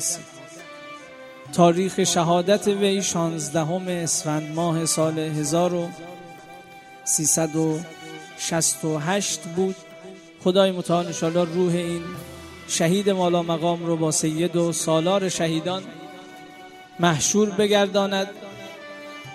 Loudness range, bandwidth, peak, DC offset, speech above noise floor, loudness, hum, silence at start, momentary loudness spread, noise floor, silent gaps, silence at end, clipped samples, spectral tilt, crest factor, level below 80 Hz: 3 LU; 14.5 kHz; -2 dBFS; under 0.1%; 22 dB; -22 LUFS; none; 0 s; 21 LU; -44 dBFS; none; 0 s; under 0.1%; -4 dB/octave; 22 dB; -62 dBFS